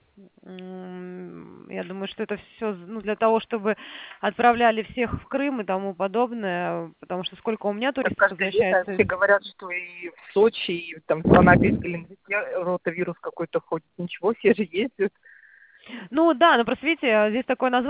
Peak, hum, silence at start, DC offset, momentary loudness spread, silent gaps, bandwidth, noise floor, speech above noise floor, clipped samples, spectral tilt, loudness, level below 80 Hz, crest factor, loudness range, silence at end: -2 dBFS; none; 0.45 s; under 0.1%; 18 LU; none; 4 kHz; -53 dBFS; 29 dB; under 0.1%; -10 dB/octave; -23 LUFS; -48 dBFS; 22 dB; 6 LU; 0 s